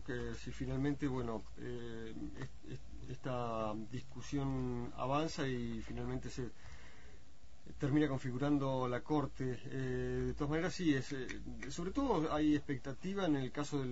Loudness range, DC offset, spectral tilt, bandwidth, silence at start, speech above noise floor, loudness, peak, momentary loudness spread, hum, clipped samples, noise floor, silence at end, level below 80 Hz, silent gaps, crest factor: 6 LU; 0.5%; -6 dB/octave; 7.6 kHz; 0 s; 23 dB; -39 LUFS; -22 dBFS; 13 LU; none; under 0.1%; -62 dBFS; 0 s; -54 dBFS; none; 16 dB